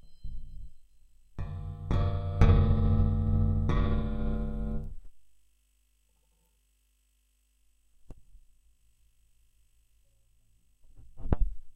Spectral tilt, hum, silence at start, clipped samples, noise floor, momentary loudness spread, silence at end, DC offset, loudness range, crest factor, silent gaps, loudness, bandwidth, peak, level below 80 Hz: -9.5 dB/octave; none; 0.05 s; under 0.1%; -71 dBFS; 23 LU; 0.05 s; under 0.1%; 14 LU; 24 dB; none; -30 LUFS; 6.2 kHz; -6 dBFS; -34 dBFS